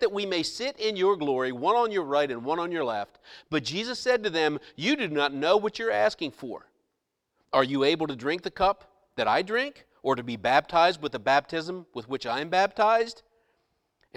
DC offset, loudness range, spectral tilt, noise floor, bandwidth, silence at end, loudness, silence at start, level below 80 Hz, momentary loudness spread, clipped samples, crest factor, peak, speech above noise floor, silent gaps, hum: under 0.1%; 2 LU; -4.5 dB/octave; -81 dBFS; 13 kHz; 1.05 s; -26 LUFS; 0 s; -60 dBFS; 11 LU; under 0.1%; 20 dB; -6 dBFS; 54 dB; none; none